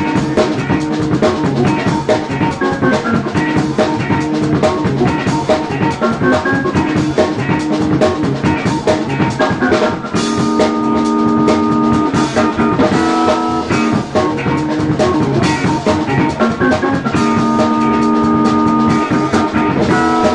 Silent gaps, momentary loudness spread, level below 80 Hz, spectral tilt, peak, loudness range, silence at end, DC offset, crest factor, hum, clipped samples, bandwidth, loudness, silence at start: none; 3 LU; -36 dBFS; -6.5 dB/octave; 0 dBFS; 2 LU; 0 s; under 0.1%; 12 dB; none; under 0.1%; 11 kHz; -14 LUFS; 0 s